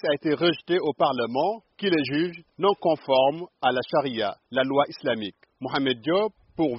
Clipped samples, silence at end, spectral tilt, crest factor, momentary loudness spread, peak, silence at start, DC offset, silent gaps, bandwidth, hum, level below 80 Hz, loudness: under 0.1%; 0 s; -3 dB/octave; 18 dB; 7 LU; -8 dBFS; 0.05 s; under 0.1%; none; 5.8 kHz; none; -66 dBFS; -25 LUFS